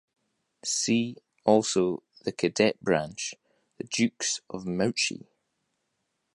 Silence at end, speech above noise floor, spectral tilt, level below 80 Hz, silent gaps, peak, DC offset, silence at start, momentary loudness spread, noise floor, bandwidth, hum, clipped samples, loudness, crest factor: 1.15 s; 52 dB; -3.5 dB/octave; -66 dBFS; none; -8 dBFS; under 0.1%; 0.65 s; 12 LU; -79 dBFS; 11.5 kHz; none; under 0.1%; -28 LUFS; 22 dB